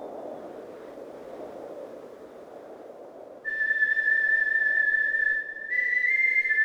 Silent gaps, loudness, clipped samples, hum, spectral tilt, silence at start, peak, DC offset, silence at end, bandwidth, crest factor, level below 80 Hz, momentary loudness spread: none; -23 LUFS; under 0.1%; none; -3.5 dB/octave; 0 s; -14 dBFS; under 0.1%; 0 s; 8.8 kHz; 14 dB; -70 dBFS; 24 LU